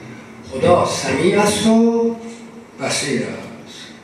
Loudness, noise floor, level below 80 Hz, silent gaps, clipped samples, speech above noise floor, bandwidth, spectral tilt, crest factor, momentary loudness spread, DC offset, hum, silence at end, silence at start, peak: -17 LUFS; -36 dBFS; -52 dBFS; none; under 0.1%; 20 dB; 13 kHz; -4.5 dB/octave; 16 dB; 21 LU; under 0.1%; none; 0.1 s; 0 s; -2 dBFS